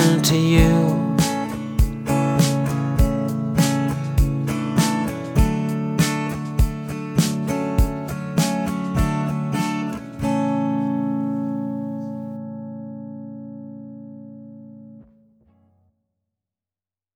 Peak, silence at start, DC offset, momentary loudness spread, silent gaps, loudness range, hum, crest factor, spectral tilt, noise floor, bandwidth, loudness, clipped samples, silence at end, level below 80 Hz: -2 dBFS; 0 s; under 0.1%; 17 LU; none; 16 LU; none; 18 dB; -6 dB/octave; under -90 dBFS; over 20 kHz; -21 LUFS; under 0.1%; 2.15 s; -30 dBFS